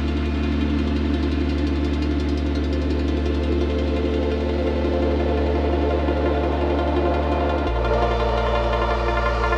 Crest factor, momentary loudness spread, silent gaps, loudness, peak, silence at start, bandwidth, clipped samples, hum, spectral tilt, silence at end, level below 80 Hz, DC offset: 14 dB; 2 LU; none; -22 LUFS; -6 dBFS; 0 s; 7.4 kHz; under 0.1%; none; -8 dB/octave; 0 s; -24 dBFS; under 0.1%